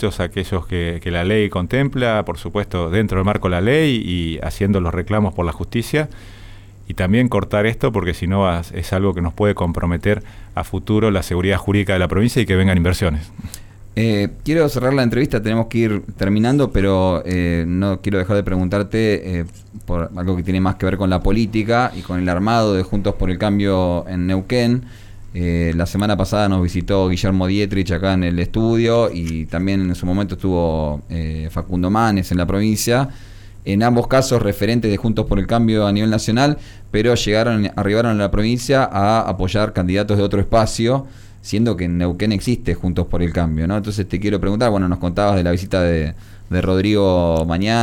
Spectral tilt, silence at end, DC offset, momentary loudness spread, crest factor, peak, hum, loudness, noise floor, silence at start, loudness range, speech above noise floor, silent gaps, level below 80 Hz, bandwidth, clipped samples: -6.5 dB/octave; 0 s; under 0.1%; 7 LU; 12 dB; -4 dBFS; none; -18 LUFS; -38 dBFS; 0 s; 3 LU; 20 dB; none; -32 dBFS; 18 kHz; under 0.1%